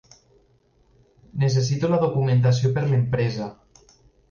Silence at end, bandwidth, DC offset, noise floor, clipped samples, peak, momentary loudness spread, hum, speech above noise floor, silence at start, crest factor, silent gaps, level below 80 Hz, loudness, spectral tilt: 0.8 s; 7.2 kHz; under 0.1%; -61 dBFS; under 0.1%; -10 dBFS; 11 LU; none; 40 dB; 1.35 s; 14 dB; none; -52 dBFS; -22 LUFS; -7 dB/octave